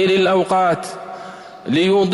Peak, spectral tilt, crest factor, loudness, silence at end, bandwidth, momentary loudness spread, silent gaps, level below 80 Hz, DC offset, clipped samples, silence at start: -8 dBFS; -5.5 dB/octave; 10 dB; -17 LUFS; 0 s; 12 kHz; 18 LU; none; -58 dBFS; under 0.1%; under 0.1%; 0 s